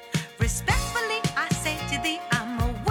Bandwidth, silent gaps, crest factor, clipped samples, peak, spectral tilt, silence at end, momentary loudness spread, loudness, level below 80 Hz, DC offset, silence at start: 19.5 kHz; none; 18 dB; under 0.1%; -8 dBFS; -4 dB/octave; 0 s; 3 LU; -26 LUFS; -36 dBFS; under 0.1%; 0 s